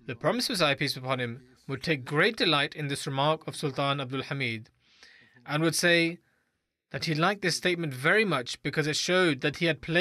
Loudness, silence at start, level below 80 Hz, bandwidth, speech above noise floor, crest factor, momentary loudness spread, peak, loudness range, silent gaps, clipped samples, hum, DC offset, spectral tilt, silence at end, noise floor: -27 LUFS; 0.05 s; -66 dBFS; 15 kHz; 51 dB; 16 dB; 10 LU; -12 dBFS; 3 LU; none; under 0.1%; none; under 0.1%; -4 dB/octave; 0 s; -79 dBFS